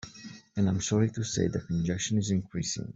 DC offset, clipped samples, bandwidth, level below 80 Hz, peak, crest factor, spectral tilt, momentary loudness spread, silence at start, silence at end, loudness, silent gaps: under 0.1%; under 0.1%; 8.2 kHz; -56 dBFS; -14 dBFS; 16 dB; -5.5 dB/octave; 9 LU; 0.05 s; 0.05 s; -30 LUFS; none